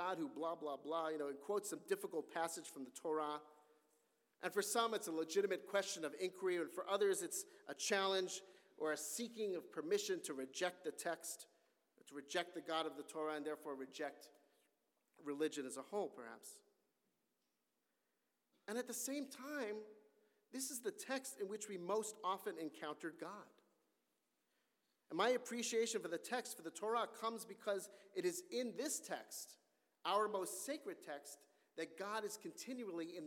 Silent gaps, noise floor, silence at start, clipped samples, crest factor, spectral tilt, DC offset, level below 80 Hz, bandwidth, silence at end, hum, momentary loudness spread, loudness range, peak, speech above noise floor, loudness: none; -87 dBFS; 0 s; under 0.1%; 22 dB; -2.5 dB/octave; under 0.1%; under -90 dBFS; 17.5 kHz; 0 s; none; 12 LU; 8 LU; -24 dBFS; 43 dB; -44 LUFS